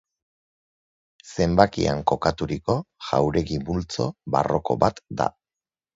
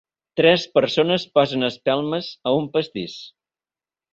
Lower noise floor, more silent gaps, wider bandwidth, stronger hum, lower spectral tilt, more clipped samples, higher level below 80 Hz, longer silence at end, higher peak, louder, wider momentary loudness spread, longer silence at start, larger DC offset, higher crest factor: about the same, under -90 dBFS vs under -90 dBFS; neither; about the same, 7.8 kHz vs 7.8 kHz; neither; about the same, -6.5 dB/octave vs -5.5 dB/octave; neither; first, -44 dBFS vs -62 dBFS; second, 0.65 s vs 0.85 s; about the same, 0 dBFS vs -2 dBFS; second, -24 LUFS vs -20 LUFS; second, 9 LU vs 14 LU; first, 1.25 s vs 0.35 s; neither; about the same, 24 dB vs 20 dB